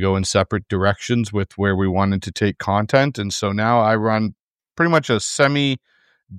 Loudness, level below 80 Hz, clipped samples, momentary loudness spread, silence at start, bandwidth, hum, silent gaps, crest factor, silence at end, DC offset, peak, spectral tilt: -19 LUFS; -50 dBFS; under 0.1%; 6 LU; 0 s; 13.5 kHz; none; 4.40-4.59 s; 18 dB; 0 s; under 0.1%; -2 dBFS; -5 dB/octave